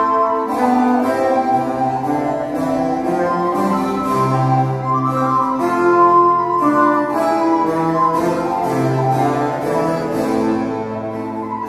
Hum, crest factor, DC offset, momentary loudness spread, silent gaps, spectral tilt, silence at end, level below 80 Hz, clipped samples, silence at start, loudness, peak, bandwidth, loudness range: none; 14 dB; under 0.1%; 6 LU; none; -7.5 dB/octave; 0 s; -50 dBFS; under 0.1%; 0 s; -17 LUFS; -2 dBFS; 15 kHz; 3 LU